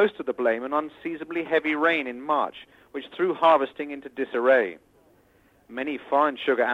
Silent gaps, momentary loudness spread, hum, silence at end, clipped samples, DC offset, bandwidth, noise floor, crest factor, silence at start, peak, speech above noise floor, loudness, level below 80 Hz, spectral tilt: none; 14 LU; none; 0 s; under 0.1%; under 0.1%; 8.2 kHz; -60 dBFS; 18 dB; 0 s; -8 dBFS; 36 dB; -25 LUFS; -70 dBFS; -6 dB/octave